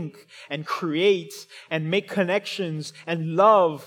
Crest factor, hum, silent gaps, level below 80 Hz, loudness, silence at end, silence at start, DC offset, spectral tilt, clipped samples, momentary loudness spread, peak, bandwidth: 18 dB; none; none; -86 dBFS; -23 LUFS; 0 s; 0 s; under 0.1%; -5.5 dB/octave; under 0.1%; 17 LU; -6 dBFS; 17.5 kHz